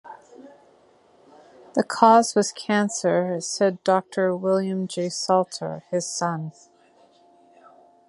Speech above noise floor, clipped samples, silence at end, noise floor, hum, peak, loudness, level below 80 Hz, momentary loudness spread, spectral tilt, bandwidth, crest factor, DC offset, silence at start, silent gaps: 35 dB; under 0.1%; 1.6 s; -57 dBFS; none; -2 dBFS; -22 LUFS; -74 dBFS; 11 LU; -4.5 dB/octave; 11.5 kHz; 24 dB; under 0.1%; 0.05 s; none